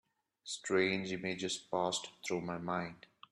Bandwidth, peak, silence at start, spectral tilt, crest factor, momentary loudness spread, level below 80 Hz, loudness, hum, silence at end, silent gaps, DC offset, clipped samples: 12 kHz; -18 dBFS; 0.45 s; -3.5 dB/octave; 20 dB; 13 LU; -74 dBFS; -37 LUFS; none; 0.35 s; none; under 0.1%; under 0.1%